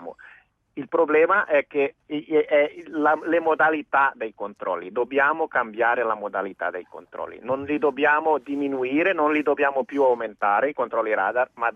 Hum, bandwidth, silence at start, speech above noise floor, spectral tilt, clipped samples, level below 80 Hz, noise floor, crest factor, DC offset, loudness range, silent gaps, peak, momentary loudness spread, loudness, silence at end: none; 6.4 kHz; 0 s; 31 dB; -6.5 dB/octave; under 0.1%; -70 dBFS; -54 dBFS; 16 dB; under 0.1%; 3 LU; none; -6 dBFS; 12 LU; -23 LUFS; 0.05 s